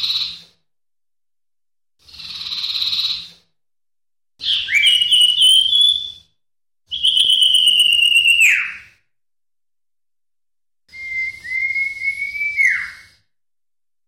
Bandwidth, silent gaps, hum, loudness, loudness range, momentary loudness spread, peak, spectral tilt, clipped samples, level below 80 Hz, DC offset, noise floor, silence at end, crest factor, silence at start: 16.5 kHz; none; none; -13 LUFS; 12 LU; 16 LU; -4 dBFS; 3.5 dB/octave; under 0.1%; -60 dBFS; under 0.1%; under -90 dBFS; 1.1 s; 16 dB; 0 s